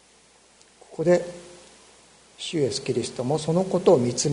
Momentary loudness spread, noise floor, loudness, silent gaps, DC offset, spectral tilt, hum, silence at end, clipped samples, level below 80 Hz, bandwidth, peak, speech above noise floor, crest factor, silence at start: 17 LU; -56 dBFS; -24 LUFS; none; under 0.1%; -5 dB/octave; none; 0 s; under 0.1%; -62 dBFS; 11 kHz; -4 dBFS; 34 dB; 22 dB; 0.9 s